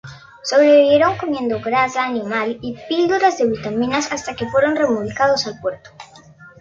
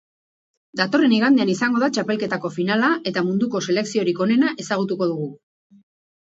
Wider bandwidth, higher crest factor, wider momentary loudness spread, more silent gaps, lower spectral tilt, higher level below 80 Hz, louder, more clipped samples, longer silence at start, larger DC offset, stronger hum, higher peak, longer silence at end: about the same, 7.8 kHz vs 8 kHz; about the same, 16 dB vs 18 dB; first, 12 LU vs 8 LU; neither; about the same, -4.5 dB/octave vs -5 dB/octave; first, -52 dBFS vs -70 dBFS; first, -17 LUFS vs -20 LUFS; neither; second, 0.05 s vs 0.75 s; neither; neither; about the same, -2 dBFS vs -4 dBFS; second, 0.15 s vs 0.85 s